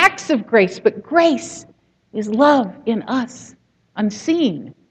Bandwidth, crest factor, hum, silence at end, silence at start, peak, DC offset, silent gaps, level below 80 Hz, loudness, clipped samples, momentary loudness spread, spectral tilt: 15 kHz; 18 dB; none; 0.2 s; 0 s; 0 dBFS; under 0.1%; none; -62 dBFS; -18 LUFS; under 0.1%; 16 LU; -5 dB/octave